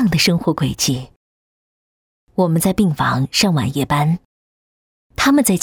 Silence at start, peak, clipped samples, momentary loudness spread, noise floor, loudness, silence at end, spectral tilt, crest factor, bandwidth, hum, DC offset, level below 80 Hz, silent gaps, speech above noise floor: 0 s; -2 dBFS; under 0.1%; 8 LU; under -90 dBFS; -17 LUFS; 0 s; -4.5 dB/octave; 16 dB; over 20 kHz; none; under 0.1%; -44 dBFS; 1.16-2.27 s, 4.25-5.10 s; over 74 dB